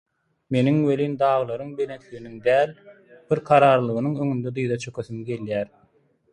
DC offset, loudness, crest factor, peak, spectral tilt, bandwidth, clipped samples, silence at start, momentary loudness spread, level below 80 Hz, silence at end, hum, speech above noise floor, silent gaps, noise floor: under 0.1%; -23 LUFS; 20 dB; -2 dBFS; -7.5 dB/octave; 10.5 kHz; under 0.1%; 0.5 s; 13 LU; -62 dBFS; 0.65 s; none; 40 dB; none; -62 dBFS